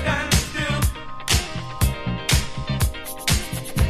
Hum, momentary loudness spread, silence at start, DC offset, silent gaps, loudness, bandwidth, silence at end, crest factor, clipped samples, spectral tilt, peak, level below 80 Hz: none; 6 LU; 0 s; under 0.1%; none; -23 LUFS; 15.5 kHz; 0 s; 18 dB; under 0.1%; -3.5 dB/octave; -6 dBFS; -28 dBFS